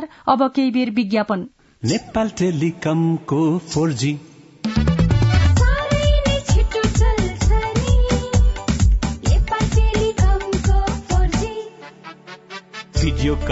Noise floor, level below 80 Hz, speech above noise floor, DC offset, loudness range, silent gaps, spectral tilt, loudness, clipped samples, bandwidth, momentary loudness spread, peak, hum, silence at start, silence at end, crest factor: -39 dBFS; -22 dBFS; 20 dB; under 0.1%; 3 LU; none; -6 dB/octave; -19 LUFS; under 0.1%; 8 kHz; 12 LU; -2 dBFS; none; 0 s; 0 s; 16 dB